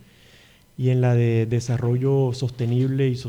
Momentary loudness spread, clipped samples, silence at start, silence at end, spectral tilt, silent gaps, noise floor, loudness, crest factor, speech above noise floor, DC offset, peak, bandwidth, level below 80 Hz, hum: 5 LU; under 0.1%; 0.8 s; 0 s; -8 dB/octave; none; -52 dBFS; -22 LUFS; 12 dB; 32 dB; under 0.1%; -10 dBFS; 9.8 kHz; -54 dBFS; none